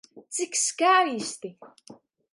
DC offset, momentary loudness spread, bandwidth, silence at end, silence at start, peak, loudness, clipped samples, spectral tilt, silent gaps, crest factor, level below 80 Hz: under 0.1%; 17 LU; 11.5 kHz; 0.4 s; 0.15 s; -8 dBFS; -24 LUFS; under 0.1%; -1 dB/octave; none; 20 dB; -82 dBFS